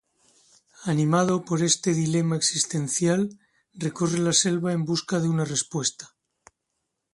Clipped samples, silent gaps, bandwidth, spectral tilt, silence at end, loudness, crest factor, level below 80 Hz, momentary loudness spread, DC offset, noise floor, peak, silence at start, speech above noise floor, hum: under 0.1%; none; 11.5 kHz; -4 dB/octave; 1.1 s; -24 LUFS; 18 dB; -66 dBFS; 7 LU; under 0.1%; -80 dBFS; -6 dBFS; 0.8 s; 56 dB; none